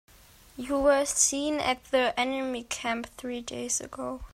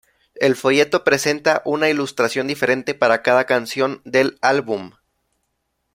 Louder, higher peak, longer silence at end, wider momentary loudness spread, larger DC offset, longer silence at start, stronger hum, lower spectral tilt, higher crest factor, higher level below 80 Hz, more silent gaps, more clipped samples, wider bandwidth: second, -28 LUFS vs -18 LUFS; second, -6 dBFS vs 0 dBFS; second, 0.05 s vs 1.05 s; first, 13 LU vs 5 LU; neither; first, 0.55 s vs 0.35 s; neither; second, -1.5 dB/octave vs -4 dB/octave; about the same, 22 dB vs 18 dB; first, -54 dBFS vs -62 dBFS; neither; neither; about the same, 16 kHz vs 16.5 kHz